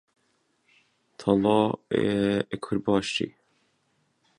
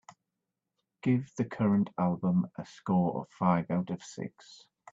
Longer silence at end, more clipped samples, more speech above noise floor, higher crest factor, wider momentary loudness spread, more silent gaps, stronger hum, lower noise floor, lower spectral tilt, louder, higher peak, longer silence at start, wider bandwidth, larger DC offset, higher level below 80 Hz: first, 1.1 s vs 0.4 s; neither; second, 46 dB vs 56 dB; about the same, 20 dB vs 20 dB; second, 8 LU vs 12 LU; neither; neither; second, -71 dBFS vs -87 dBFS; second, -6 dB/octave vs -8 dB/octave; first, -26 LUFS vs -31 LUFS; first, -8 dBFS vs -12 dBFS; first, 1.2 s vs 1.05 s; first, 11 kHz vs 7.6 kHz; neither; first, -58 dBFS vs -70 dBFS